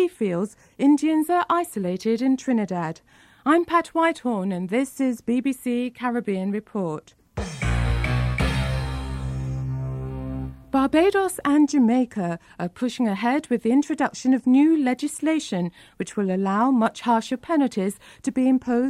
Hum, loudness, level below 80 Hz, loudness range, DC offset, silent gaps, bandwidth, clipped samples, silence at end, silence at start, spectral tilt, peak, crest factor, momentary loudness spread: none; -23 LUFS; -38 dBFS; 4 LU; under 0.1%; none; 14 kHz; under 0.1%; 0 s; 0 s; -6.5 dB/octave; -8 dBFS; 16 dB; 12 LU